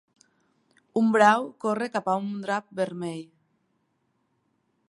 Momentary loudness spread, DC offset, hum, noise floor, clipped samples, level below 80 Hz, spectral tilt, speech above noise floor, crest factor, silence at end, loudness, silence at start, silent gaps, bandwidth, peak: 14 LU; under 0.1%; none; -73 dBFS; under 0.1%; -78 dBFS; -5.5 dB/octave; 48 dB; 22 dB; 1.65 s; -25 LUFS; 0.95 s; none; 11.5 kHz; -4 dBFS